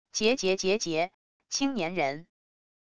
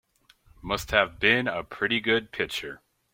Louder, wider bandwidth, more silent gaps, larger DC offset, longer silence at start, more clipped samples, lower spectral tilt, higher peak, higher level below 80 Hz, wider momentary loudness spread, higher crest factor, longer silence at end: second, -28 LUFS vs -25 LUFS; second, 11 kHz vs 16.5 kHz; first, 1.14-1.40 s vs none; first, 0.4% vs under 0.1%; second, 0.05 s vs 0.65 s; neither; about the same, -3 dB/octave vs -4 dB/octave; second, -12 dBFS vs -4 dBFS; second, -64 dBFS vs -50 dBFS; second, 8 LU vs 11 LU; second, 18 dB vs 24 dB; first, 0.7 s vs 0.35 s